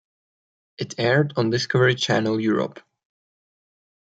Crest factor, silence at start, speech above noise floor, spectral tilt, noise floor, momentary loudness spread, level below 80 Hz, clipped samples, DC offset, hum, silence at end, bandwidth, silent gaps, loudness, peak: 18 dB; 0.8 s; over 69 dB; -5.5 dB/octave; under -90 dBFS; 11 LU; -66 dBFS; under 0.1%; under 0.1%; none; 1.4 s; 9 kHz; none; -21 LUFS; -6 dBFS